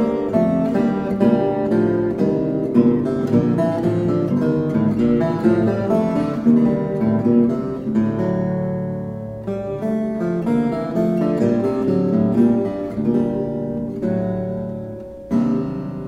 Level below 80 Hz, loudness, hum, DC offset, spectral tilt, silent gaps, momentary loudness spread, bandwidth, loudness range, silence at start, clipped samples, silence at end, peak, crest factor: -46 dBFS; -19 LUFS; none; under 0.1%; -9.5 dB/octave; none; 8 LU; 7.4 kHz; 4 LU; 0 s; under 0.1%; 0 s; -4 dBFS; 16 dB